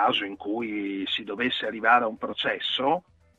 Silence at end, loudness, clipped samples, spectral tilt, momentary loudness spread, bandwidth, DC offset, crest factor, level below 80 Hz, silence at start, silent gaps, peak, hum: 0.4 s; -26 LUFS; under 0.1%; -5 dB/octave; 9 LU; 8 kHz; under 0.1%; 20 dB; -66 dBFS; 0 s; none; -6 dBFS; none